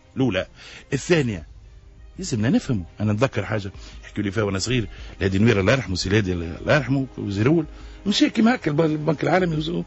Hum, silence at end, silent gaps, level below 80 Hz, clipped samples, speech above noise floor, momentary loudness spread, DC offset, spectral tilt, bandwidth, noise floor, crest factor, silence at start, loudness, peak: none; 0 s; none; -44 dBFS; under 0.1%; 23 dB; 12 LU; under 0.1%; -6 dB/octave; 8.2 kHz; -45 dBFS; 16 dB; 0.15 s; -22 LUFS; -6 dBFS